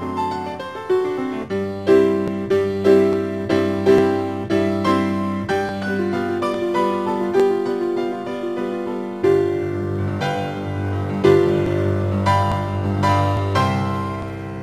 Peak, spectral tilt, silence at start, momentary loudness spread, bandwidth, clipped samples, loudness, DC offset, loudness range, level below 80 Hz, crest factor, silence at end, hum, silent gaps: -2 dBFS; -7.5 dB/octave; 0 s; 9 LU; 12.5 kHz; under 0.1%; -20 LUFS; 0.2%; 3 LU; -52 dBFS; 16 dB; 0 s; none; none